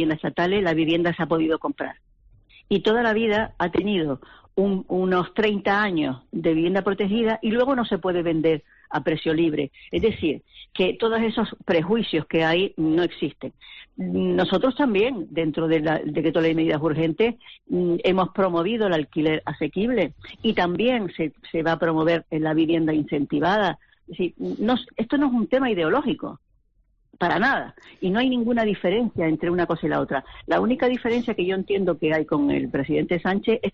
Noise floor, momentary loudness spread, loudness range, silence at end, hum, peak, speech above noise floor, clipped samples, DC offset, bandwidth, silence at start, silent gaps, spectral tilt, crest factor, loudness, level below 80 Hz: -64 dBFS; 7 LU; 2 LU; 0.05 s; none; -10 dBFS; 42 dB; under 0.1%; under 0.1%; 6.8 kHz; 0 s; none; -4.5 dB/octave; 12 dB; -23 LUFS; -52 dBFS